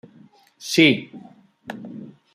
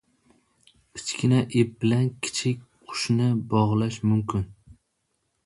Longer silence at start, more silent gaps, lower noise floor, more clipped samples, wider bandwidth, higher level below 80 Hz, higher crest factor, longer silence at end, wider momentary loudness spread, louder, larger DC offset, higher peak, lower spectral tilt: second, 0.65 s vs 0.95 s; neither; second, -52 dBFS vs -75 dBFS; neither; first, 15.5 kHz vs 11.5 kHz; second, -66 dBFS vs -52 dBFS; about the same, 22 dB vs 18 dB; second, 0.3 s vs 0.95 s; first, 24 LU vs 12 LU; first, -18 LUFS vs -25 LUFS; neither; first, -2 dBFS vs -8 dBFS; second, -4 dB/octave vs -6 dB/octave